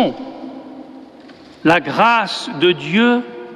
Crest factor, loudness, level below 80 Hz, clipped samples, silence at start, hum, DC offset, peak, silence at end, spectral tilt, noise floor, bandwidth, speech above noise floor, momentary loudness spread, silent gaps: 16 dB; -15 LUFS; -58 dBFS; under 0.1%; 0 s; none; under 0.1%; -2 dBFS; 0 s; -5 dB/octave; -40 dBFS; 11.5 kHz; 25 dB; 20 LU; none